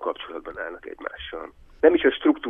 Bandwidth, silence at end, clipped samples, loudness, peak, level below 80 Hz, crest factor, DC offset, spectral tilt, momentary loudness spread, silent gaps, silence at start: 3.8 kHz; 0 s; under 0.1%; -23 LUFS; -4 dBFS; -52 dBFS; 20 dB; under 0.1%; -7 dB/octave; 18 LU; none; 0 s